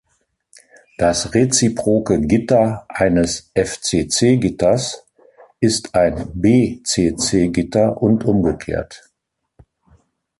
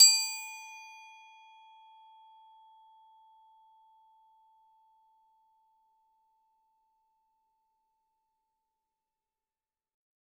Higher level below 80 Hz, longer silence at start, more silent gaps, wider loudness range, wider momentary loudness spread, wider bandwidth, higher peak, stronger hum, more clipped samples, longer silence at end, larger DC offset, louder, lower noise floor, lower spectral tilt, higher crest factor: first, -40 dBFS vs under -90 dBFS; first, 1 s vs 0 s; neither; second, 2 LU vs 23 LU; second, 6 LU vs 29 LU; second, 11.5 kHz vs 16.5 kHz; first, -2 dBFS vs -8 dBFS; second, none vs 60 Hz at -110 dBFS; neither; second, 1.45 s vs 9.8 s; neither; first, -17 LUFS vs -26 LUFS; second, -75 dBFS vs under -90 dBFS; first, -5 dB/octave vs 9 dB/octave; second, 14 dB vs 30 dB